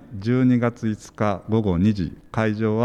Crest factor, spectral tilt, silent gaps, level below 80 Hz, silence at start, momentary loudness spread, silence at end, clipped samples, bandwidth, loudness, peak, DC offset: 14 dB; -8 dB/octave; none; -46 dBFS; 0 s; 9 LU; 0 s; under 0.1%; 9.4 kHz; -22 LUFS; -8 dBFS; under 0.1%